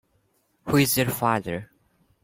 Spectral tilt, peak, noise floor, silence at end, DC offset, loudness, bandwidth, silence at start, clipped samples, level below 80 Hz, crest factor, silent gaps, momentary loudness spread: -4.5 dB/octave; -8 dBFS; -68 dBFS; 0.6 s; under 0.1%; -23 LUFS; 16.5 kHz; 0.65 s; under 0.1%; -56 dBFS; 20 dB; none; 14 LU